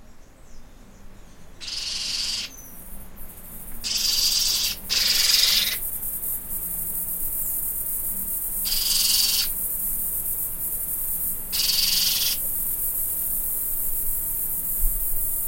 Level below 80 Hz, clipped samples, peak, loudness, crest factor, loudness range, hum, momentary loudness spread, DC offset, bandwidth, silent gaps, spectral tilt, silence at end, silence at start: -38 dBFS; under 0.1%; -4 dBFS; -22 LUFS; 22 dB; 6 LU; none; 12 LU; under 0.1%; 16.5 kHz; none; 1 dB/octave; 0 s; 0 s